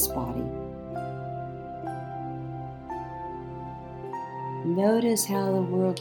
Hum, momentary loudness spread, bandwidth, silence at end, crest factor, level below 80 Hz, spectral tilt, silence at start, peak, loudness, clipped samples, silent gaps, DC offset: none; 14 LU; 18 kHz; 0 s; 20 dB; -50 dBFS; -5.5 dB/octave; 0 s; -10 dBFS; -30 LUFS; under 0.1%; none; under 0.1%